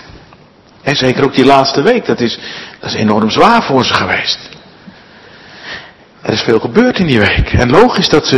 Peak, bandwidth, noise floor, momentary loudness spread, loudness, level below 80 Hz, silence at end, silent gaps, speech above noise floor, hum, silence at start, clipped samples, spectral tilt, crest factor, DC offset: 0 dBFS; 12 kHz; -42 dBFS; 16 LU; -11 LUFS; -30 dBFS; 0 s; none; 32 dB; none; 0.1 s; 1%; -5 dB/octave; 12 dB; under 0.1%